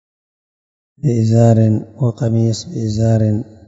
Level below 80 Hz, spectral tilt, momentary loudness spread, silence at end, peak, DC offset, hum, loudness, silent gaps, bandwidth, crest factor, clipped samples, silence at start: -46 dBFS; -8 dB/octave; 9 LU; 0.25 s; -2 dBFS; under 0.1%; none; -15 LUFS; none; 7.8 kHz; 14 dB; under 0.1%; 1.05 s